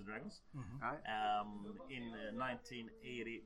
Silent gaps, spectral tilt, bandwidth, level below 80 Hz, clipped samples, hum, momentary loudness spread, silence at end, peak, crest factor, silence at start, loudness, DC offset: none; -5.5 dB/octave; 11.5 kHz; -66 dBFS; under 0.1%; none; 12 LU; 0 s; -28 dBFS; 16 dB; 0 s; -45 LUFS; under 0.1%